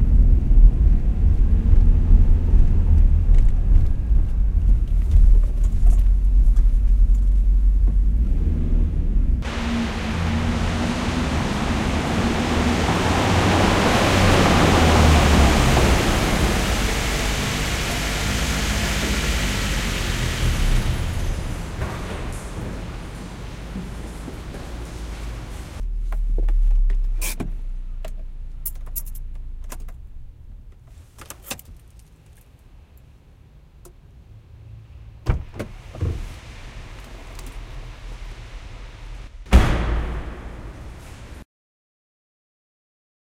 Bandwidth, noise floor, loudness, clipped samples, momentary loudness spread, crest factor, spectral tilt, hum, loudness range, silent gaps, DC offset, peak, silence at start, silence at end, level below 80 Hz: 16 kHz; -48 dBFS; -21 LUFS; under 0.1%; 22 LU; 18 dB; -5 dB/octave; none; 19 LU; none; under 0.1%; -2 dBFS; 0 s; 1.95 s; -20 dBFS